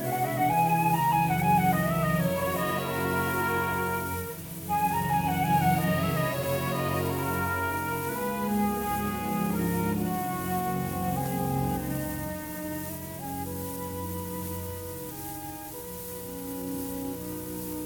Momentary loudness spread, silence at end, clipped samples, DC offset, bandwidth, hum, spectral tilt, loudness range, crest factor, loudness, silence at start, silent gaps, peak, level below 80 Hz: 12 LU; 0 s; under 0.1%; under 0.1%; 19 kHz; none; -5.5 dB/octave; 9 LU; 16 dB; -29 LUFS; 0 s; none; -12 dBFS; -50 dBFS